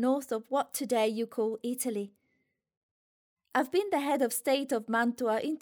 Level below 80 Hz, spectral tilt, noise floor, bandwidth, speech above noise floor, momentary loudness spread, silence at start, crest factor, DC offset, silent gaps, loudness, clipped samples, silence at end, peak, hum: -82 dBFS; -3.5 dB/octave; -78 dBFS; over 20 kHz; 48 dB; 5 LU; 0 s; 16 dB; under 0.1%; 2.77-3.37 s; -31 LUFS; under 0.1%; 0.05 s; -14 dBFS; none